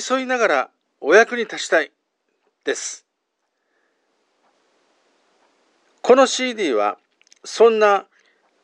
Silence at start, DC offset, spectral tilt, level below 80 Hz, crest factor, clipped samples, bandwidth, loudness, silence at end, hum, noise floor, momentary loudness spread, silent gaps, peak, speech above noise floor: 0 s; under 0.1%; -2 dB/octave; -86 dBFS; 20 dB; under 0.1%; 10 kHz; -18 LUFS; 0.6 s; none; -75 dBFS; 17 LU; none; 0 dBFS; 58 dB